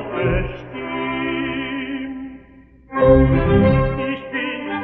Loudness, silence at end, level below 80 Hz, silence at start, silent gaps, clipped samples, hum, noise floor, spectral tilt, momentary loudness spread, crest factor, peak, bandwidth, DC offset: -19 LUFS; 0 s; -30 dBFS; 0 s; none; under 0.1%; none; -46 dBFS; -11 dB/octave; 15 LU; 18 dB; -2 dBFS; 4.5 kHz; under 0.1%